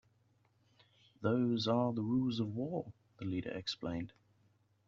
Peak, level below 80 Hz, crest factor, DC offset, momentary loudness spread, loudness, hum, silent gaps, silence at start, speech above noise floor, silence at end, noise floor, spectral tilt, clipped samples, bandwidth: -20 dBFS; -70 dBFS; 18 dB; under 0.1%; 11 LU; -37 LUFS; none; none; 1.2 s; 37 dB; 0.8 s; -73 dBFS; -6 dB/octave; under 0.1%; 7.6 kHz